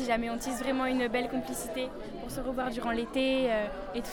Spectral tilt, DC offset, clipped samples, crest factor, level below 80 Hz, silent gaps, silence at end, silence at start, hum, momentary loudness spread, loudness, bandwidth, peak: -4 dB/octave; under 0.1%; under 0.1%; 16 dB; -48 dBFS; none; 0 s; 0 s; none; 9 LU; -32 LUFS; 19 kHz; -16 dBFS